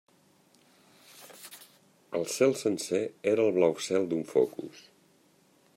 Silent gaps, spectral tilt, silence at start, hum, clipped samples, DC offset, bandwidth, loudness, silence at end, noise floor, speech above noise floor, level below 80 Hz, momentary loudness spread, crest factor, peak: none; -4.5 dB/octave; 1.2 s; none; under 0.1%; under 0.1%; 16 kHz; -28 LUFS; 0.95 s; -64 dBFS; 37 dB; -78 dBFS; 21 LU; 20 dB; -12 dBFS